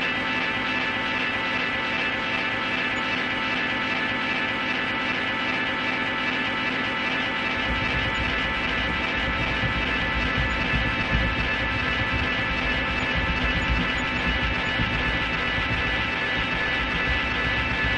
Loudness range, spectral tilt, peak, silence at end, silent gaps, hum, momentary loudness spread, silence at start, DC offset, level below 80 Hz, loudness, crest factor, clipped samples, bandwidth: 1 LU; -5 dB/octave; -8 dBFS; 0 s; none; none; 1 LU; 0 s; under 0.1%; -36 dBFS; -24 LUFS; 16 dB; under 0.1%; 10 kHz